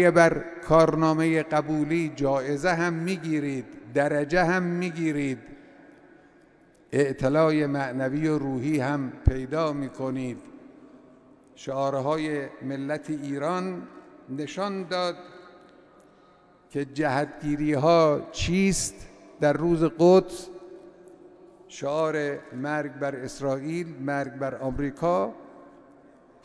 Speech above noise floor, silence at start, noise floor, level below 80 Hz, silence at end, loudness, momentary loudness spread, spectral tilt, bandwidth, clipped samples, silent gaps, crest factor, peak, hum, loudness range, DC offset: 32 dB; 0 s; -57 dBFS; -44 dBFS; 0.75 s; -26 LUFS; 13 LU; -6 dB/octave; 11 kHz; under 0.1%; none; 22 dB; -4 dBFS; none; 8 LU; under 0.1%